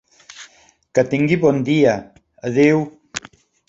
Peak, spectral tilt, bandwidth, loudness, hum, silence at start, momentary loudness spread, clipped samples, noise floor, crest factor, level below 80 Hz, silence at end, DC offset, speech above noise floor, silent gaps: -2 dBFS; -6.5 dB/octave; 8 kHz; -17 LUFS; none; 0.4 s; 18 LU; under 0.1%; -52 dBFS; 18 dB; -56 dBFS; 0.5 s; under 0.1%; 36 dB; none